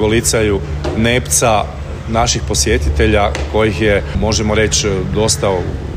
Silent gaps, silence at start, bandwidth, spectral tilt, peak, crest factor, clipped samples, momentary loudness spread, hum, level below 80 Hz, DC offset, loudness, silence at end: none; 0 s; 16 kHz; -4 dB/octave; -2 dBFS; 14 dB; under 0.1%; 6 LU; none; -22 dBFS; under 0.1%; -14 LUFS; 0 s